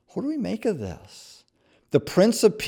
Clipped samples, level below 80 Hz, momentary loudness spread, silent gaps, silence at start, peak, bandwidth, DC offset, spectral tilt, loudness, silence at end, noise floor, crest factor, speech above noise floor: under 0.1%; -58 dBFS; 23 LU; none; 0.15 s; -6 dBFS; over 20 kHz; under 0.1%; -5.5 dB/octave; -24 LUFS; 0 s; -63 dBFS; 18 dB; 40 dB